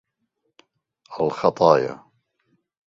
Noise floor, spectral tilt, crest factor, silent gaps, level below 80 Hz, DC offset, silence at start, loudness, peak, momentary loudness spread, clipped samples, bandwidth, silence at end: -75 dBFS; -6.5 dB/octave; 24 dB; none; -64 dBFS; under 0.1%; 1.1 s; -20 LUFS; 0 dBFS; 23 LU; under 0.1%; 7.6 kHz; 0.9 s